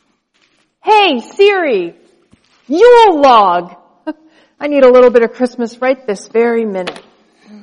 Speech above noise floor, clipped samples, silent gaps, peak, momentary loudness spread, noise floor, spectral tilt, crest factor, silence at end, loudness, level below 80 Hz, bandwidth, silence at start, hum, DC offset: 48 dB; under 0.1%; none; 0 dBFS; 18 LU; -58 dBFS; -4.5 dB/octave; 12 dB; 0.7 s; -10 LUFS; -52 dBFS; 10.5 kHz; 0.85 s; none; under 0.1%